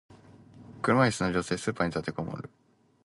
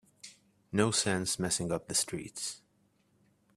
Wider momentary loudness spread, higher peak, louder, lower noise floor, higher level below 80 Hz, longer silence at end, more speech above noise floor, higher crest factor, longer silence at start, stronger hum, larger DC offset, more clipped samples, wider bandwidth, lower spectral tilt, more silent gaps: second, 14 LU vs 23 LU; about the same, -10 dBFS vs -10 dBFS; first, -29 LUFS vs -32 LUFS; second, -53 dBFS vs -71 dBFS; first, -56 dBFS vs -66 dBFS; second, 0.6 s vs 1 s; second, 25 dB vs 39 dB; about the same, 20 dB vs 24 dB; second, 0.1 s vs 0.25 s; neither; neither; neither; second, 11.5 kHz vs 15.5 kHz; first, -5.5 dB/octave vs -3 dB/octave; neither